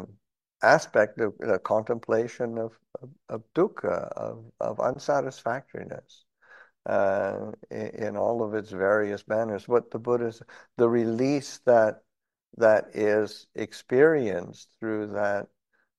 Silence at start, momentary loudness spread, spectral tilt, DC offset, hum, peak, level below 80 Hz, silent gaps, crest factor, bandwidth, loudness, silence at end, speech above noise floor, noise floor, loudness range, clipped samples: 0 s; 16 LU; -6 dB/octave; under 0.1%; none; -4 dBFS; -72 dBFS; none; 22 dB; 12 kHz; -26 LUFS; 0.55 s; 37 dB; -63 dBFS; 6 LU; under 0.1%